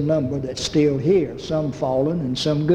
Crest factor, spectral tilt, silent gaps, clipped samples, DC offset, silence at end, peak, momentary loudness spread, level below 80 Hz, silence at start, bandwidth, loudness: 14 dB; -6.5 dB/octave; none; under 0.1%; under 0.1%; 0 s; -6 dBFS; 6 LU; -46 dBFS; 0 s; 11 kHz; -21 LUFS